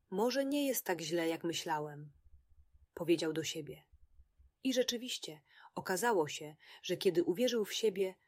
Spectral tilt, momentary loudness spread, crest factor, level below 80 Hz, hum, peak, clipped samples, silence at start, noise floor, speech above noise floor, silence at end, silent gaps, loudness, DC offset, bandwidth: -3.5 dB/octave; 15 LU; 18 dB; -72 dBFS; none; -20 dBFS; under 0.1%; 0.1 s; -65 dBFS; 30 dB; 0.15 s; none; -36 LUFS; under 0.1%; 16 kHz